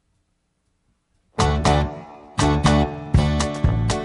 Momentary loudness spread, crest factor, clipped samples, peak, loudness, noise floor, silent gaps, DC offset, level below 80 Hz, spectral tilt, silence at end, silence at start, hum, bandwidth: 11 LU; 16 dB; under 0.1%; -4 dBFS; -20 LUFS; -70 dBFS; none; under 0.1%; -28 dBFS; -5.5 dB/octave; 0 s; 1.4 s; none; 11.5 kHz